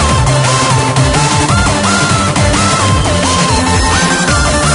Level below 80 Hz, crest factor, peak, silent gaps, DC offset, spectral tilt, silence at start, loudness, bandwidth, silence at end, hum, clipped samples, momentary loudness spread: -20 dBFS; 10 dB; 0 dBFS; none; under 0.1%; -4 dB/octave; 0 s; -10 LUFS; 11 kHz; 0 s; none; under 0.1%; 1 LU